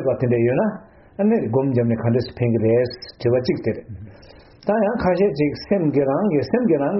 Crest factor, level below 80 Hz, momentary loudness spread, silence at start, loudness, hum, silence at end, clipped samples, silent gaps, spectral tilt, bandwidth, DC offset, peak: 14 dB; -50 dBFS; 8 LU; 0 s; -20 LUFS; none; 0 s; under 0.1%; none; -7.5 dB/octave; 6 kHz; under 0.1%; -6 dBFS